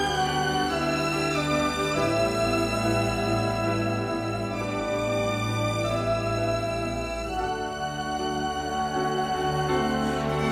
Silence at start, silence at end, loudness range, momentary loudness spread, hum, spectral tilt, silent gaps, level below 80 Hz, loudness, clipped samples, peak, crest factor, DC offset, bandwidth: 0 s; 0 s; 3 LU; 5 LU; none; -5 dB/octave; none; -44 dBFS; -26 LUFS; under 0.1%; -12 dBFS; 14 dB; under 0.1%; 15.5 kHz